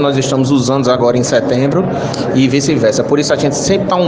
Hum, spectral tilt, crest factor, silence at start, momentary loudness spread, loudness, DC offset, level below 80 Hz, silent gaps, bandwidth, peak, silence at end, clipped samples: none; -5.5 dB/octave; 12 dB; 0 s; 3 LU; -13 LUFS; under 0.1%; -44 dBFS; none; 10 kHz; 0 dBFS; 0 s; under 0.1%